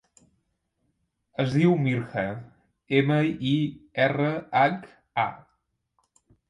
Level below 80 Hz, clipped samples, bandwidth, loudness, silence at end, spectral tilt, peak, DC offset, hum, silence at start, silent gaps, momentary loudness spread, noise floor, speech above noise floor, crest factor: -64 dBFS; under 0.1%; 11 kHz; -25 LUFS; 1.15 s; -8 dB/octave; -8 dBFS; under 0.1%; none; 1.4 s; none; 11 LU; -75 dBFS; 51 dB; 20 dB